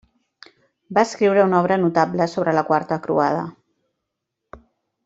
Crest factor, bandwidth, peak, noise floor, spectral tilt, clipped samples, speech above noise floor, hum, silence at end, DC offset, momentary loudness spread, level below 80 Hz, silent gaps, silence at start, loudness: 20 dB; 8 kHz; -2 dBFS; -80 dBFS; -6.5 dB/octave; under 0.1%; 61 dB; none; 0.5 s; under 0.1%; 6 LU; -62 dBFS; none; 0.9 s; -19 LUFS